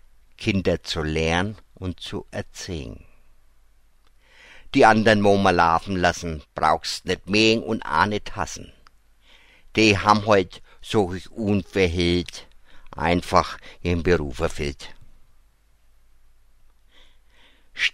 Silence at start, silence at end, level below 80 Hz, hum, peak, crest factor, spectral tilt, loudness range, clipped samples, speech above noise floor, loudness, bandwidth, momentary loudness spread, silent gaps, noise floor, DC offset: 0.4 s; 0.05 s; -42 dBFS; none; 0 dBFS; 24 dB; -5 dB/octave; 10 LU; under 0.1%; 35 dB; -22 LUFS; 15.5 kHz; 17 LU; none; -57 dBFS; under 0.1%